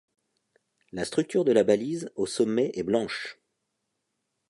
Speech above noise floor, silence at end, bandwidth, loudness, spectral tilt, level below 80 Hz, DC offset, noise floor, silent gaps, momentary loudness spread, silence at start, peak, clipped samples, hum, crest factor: 54 dB; 1.2 s; 11.5 kHz; -26 LUFS; -5 dB/octave; -66 dBFS; under 0.1%; -80 dBFS; none; 13 LU; 0.95 s; -8 dBFS; under 0.1%; none; 20 dB